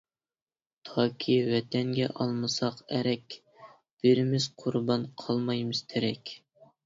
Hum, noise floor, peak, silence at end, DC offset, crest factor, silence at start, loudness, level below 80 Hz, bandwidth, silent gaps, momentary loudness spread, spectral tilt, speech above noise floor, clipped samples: none; under -90 dBFS; -10 dBFS; 0.5 s; under 0.1%; 20 dB; 0.85 s; -29 LUFS; -70 dBFS; 7.8 kHz; 3.91-3.97 s; 12 LU; -6 dB/octave; over 62 dB; under 0.1%